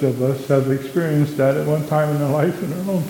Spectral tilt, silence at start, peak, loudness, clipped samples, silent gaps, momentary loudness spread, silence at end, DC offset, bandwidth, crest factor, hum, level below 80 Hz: -7.5 dB/octave; 0 s; -2 dBFS; -19 LUFS; under 0.1%; none; 4 LU; 0 s; under 0.1%; 17.5 kHz; 16 dB; none; -58 dBFS